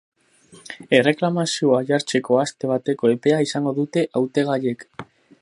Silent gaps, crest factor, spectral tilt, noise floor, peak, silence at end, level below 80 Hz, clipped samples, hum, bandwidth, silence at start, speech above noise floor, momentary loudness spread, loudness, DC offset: none; 20 dB; -5 dB/octave; -51 dBFS; 0 dBFS; 0.4 s; -70 dBFS; under 0.1%; none; 11.5 kHz; 0.7 s; 31 dB; 12 LU; -20 LUFS; under 0.1%